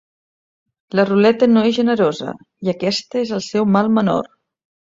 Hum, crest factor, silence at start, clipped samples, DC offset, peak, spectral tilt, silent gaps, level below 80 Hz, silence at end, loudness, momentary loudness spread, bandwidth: none; 16 dB; 0.95 s; under 0.1%; under 0.1%; -2 dBFS; -6 dB/octave; none; -60 dBFS; 0.6 s; -17 LUFS; 11 LU; 7.8 kHz